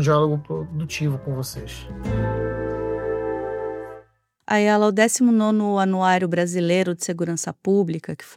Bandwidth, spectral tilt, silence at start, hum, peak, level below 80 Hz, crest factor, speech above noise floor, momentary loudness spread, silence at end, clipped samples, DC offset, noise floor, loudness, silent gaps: 16 kHz; -5.5 dB/octave; 0 s; none; -2 dBFS; -44 dBFS; 20 dB; 33 dB; 12 LU; 0 s; under 0.1%; under 0.1%; -54 dBFS; -22 LUFS; none